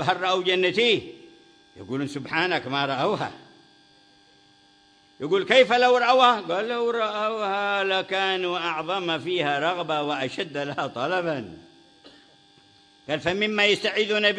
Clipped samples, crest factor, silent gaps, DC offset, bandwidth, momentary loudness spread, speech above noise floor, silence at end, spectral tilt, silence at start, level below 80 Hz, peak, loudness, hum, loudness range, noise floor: under 0.1%; 20 dB; none; under 0.1%; 10.5 kHz; 12 LU; 34 dB; 0 s; -4 dB/octave; 0 s; -66 dBFS; -4 dBFS; -23 LUFS; none; 8 LU; -58 dBFS